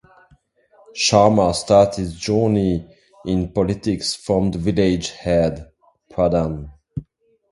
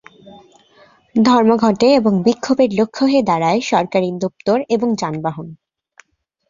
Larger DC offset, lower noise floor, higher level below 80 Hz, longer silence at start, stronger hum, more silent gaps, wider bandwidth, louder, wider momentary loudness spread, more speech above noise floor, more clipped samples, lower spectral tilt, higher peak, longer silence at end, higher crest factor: neither; first, -57 dBFS vs -51 dBFS; first, -40 dBFS vs -56 dBFS; first, 0.95 s vs 0.25 s; neither; neither; first, 11.5 kHz vs 7.4 kHz; second, -19 LUFS vs -16 LUFS; first, 18 LU vs 10 LU; about the same, 39 dB vs 36 dB; neither; about the same, -5.5 dB/octave vs -6 dB/octave; about the same, 0 dBFS vs -2 dBFS; second, 0.5 s vs 0.95 s; about the same, 20 dB vs 16 dB